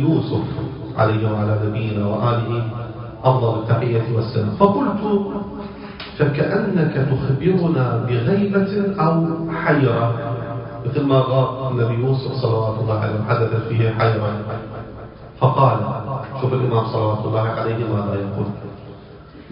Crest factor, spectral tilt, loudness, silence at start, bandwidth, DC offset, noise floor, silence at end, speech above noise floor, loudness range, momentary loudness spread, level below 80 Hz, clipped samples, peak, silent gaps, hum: 20 dB; -12 dB/octave; -20 LUFS; 0 s; 5.4 kHz; under 0.1%; -40 dBFS; 0 s; 21 dB; 2 LU; 12 LU; -44 dBFS; under 0.1%; 0 dBFS; none; none